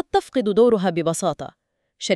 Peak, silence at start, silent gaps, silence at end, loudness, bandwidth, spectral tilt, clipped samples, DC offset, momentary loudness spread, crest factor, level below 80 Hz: -6 dBFS; 0.15 s; none; 0 s; -20 LUFS; 13 kHz; -5 dB/octave; under 0.1%; under 0.1%; 16 LU; 16 dB; -54 dBFS